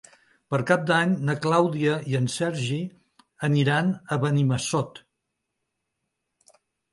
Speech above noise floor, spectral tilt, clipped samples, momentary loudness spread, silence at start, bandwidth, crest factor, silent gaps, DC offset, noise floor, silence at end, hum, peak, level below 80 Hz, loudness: 57 dB; -6 dB/octave; under 0.1%; 8 LU; 0.5 s; 11.5 kHz; 20 dB; none; under 0.1%; -80 dBFS; 1.95 s; none; -6 dBFS; -64 dBFS; -24 LUFS